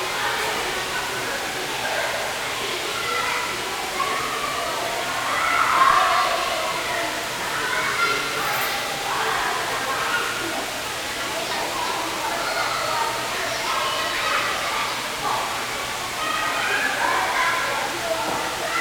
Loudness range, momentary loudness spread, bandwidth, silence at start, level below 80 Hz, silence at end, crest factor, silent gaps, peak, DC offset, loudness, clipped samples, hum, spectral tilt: 3 LU; 5 LU; over 20 kHz; 0 s; -52 dBFS; 0 s; 20 dB; none; -4 dBFS; under 0.1%; -23 LUFS; under 0.1%; none; -1 dB/octave